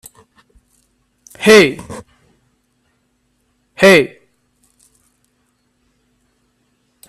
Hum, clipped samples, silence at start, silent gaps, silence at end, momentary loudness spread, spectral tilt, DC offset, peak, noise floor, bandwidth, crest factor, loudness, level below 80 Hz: none; under 0.1%; 1.4 s; none; 3.05 s; 24 LU; -4 dB/octave; under 0.1%; 0 dBFS; -63 dBFS; 14.5 kHz; 18 dB; -10 LUFS; -56 dBFS